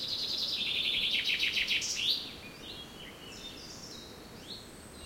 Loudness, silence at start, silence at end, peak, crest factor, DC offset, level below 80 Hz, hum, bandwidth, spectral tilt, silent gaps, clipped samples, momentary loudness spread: -29 LUFS; 0 s; 0 s; -16 dBFS; 18 dB; under 0.1%; -60 dBFS; none; 16.5 kHz; -0.5 dB/octave; none; under 0.1%; 18 LU